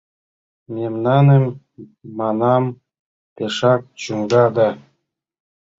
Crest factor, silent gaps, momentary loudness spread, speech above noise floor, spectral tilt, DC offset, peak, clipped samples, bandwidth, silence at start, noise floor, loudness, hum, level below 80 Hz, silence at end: 16 dB; 2.99-3.36 s; 16 LU; 55 dB; -7.5 dB/octave; under 0.1%; -2 dBFS; under 0.1%; 7.8 kHz; 0.7 s; -71 dBFS; -18 LUFS; none; -60 dBFS; 1 s